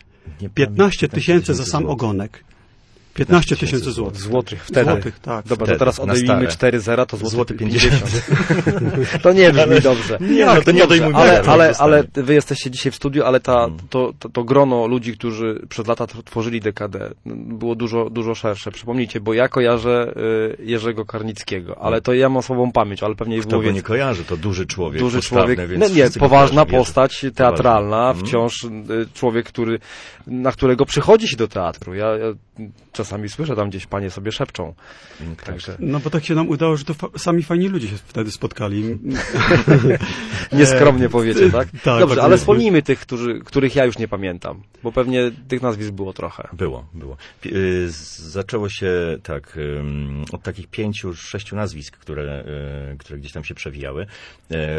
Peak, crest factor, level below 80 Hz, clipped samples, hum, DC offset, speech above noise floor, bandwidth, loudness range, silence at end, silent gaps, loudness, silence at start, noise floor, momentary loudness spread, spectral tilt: 0 dBFS; 16 dB; -38 dBFS; under 0.1%; none; under 0.1%; 33 dB; 11 kHz; 12 LU; 0 s; none; -17 LUFS; 0.25 s; -50 dBFS; 18 LU; -6 dB/octave